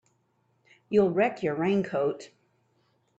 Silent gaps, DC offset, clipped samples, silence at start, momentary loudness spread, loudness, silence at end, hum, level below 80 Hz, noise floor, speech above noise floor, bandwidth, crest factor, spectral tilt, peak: none; under 0.1%; under 0.1%; 0.9 s; 6 LU; -27 LUFS; 0.9 s; none; -68 dBFS; -71 dBFS; 45 dB; 8 kHz; 18 dB; -7.5 dB/octave; -12 dBFS